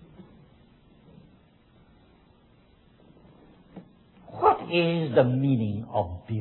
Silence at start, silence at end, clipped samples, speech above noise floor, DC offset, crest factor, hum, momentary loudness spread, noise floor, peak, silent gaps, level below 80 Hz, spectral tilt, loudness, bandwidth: 0.2 s; 0 s; under 0.1%; 34 dB; under 0.1%; 22 dB; none; 27 LU; -59 dBFS; -6 dBFS; none; -58 dBFS; -11 dB/octave; -25 LUFS; 4.3 kHz